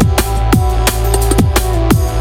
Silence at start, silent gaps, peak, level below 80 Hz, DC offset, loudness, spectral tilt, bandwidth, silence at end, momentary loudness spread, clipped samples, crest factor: 0 s; none; 0 dBFS; -16 dBFS; under 0.1%; -13 LUFS; -5 dB/octave; 17 kHz; 0 s; 2 LU; under 0.1%; 12 dB